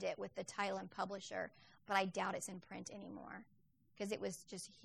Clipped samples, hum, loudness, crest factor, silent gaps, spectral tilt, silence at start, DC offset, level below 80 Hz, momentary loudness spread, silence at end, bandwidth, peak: under 0.1%; none; -44 LUFS; 24 dB; none; -3.5 dB/octave; 0 s; under 0.1%; -82 dBFS; 13 LU; 0 s; 14 kHz; -20 dBFS